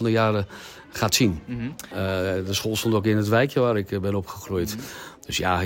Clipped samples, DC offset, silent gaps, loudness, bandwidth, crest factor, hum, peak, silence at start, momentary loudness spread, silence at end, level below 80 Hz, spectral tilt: under 0.1%; under 0.1%; none; -24 LUFS; 16.5 kHz; 18 dB; none; -6 dBFS; 0 s; 13 LU; 0 s; -52 dBFS; -5 dB/octave